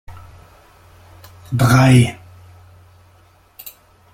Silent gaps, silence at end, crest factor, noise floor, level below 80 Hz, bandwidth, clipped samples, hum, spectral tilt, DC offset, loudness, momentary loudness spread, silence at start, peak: none; 0.45 s; 18 dB; -51 dBFS; -44 dBFS; 16 kHz; under 0.1%; none; -6.5 dB/octave; under 0.1%; -14 LUFS; 26 LU; 0.1 s; -2 dBFS